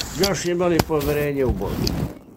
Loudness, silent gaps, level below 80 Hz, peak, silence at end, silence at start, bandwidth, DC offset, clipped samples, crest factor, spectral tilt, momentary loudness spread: -22 LUFS; none; -34 dBFS; 0 dBFS; 0 s; 0 s; 16.5 kHz; under 0.1%; under 0.1%; 22 dB; -5 dB/octave; 5 LU